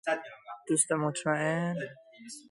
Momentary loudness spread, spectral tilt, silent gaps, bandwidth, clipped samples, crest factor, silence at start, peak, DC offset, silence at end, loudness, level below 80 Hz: 19 LU; -4 dB/octave; none; 11.5 kHz; under 0.1%; 20 dB; 0.05 s; -12 dBFS; under 0.1%; 0.1 s; -30 LUFS; -76 dBFS